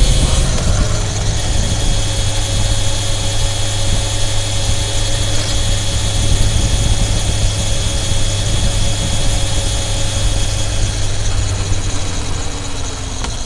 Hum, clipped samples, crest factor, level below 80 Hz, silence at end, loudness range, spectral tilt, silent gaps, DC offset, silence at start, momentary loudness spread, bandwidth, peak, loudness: none; under 0.1%; 14 dB; -18 dBFS; 0 s; 2 LU; -3.5 dB/octave; none; under 0.1%; 0 s; 4 LU; 11.5 kHz; 0 dBFS; -17 LUFS